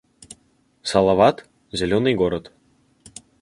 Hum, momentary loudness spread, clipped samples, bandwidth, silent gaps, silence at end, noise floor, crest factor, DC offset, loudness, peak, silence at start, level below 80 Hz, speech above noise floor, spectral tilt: none; 25 LU; under 0.1%; 11.5 kHz; none; 1 s; -61 dBFS; 20 dB; under 0.1%; -20 LUFS; -2 dBFS; 0.85 s; -48 dBFS; 43 dB; -5.5 dB/octave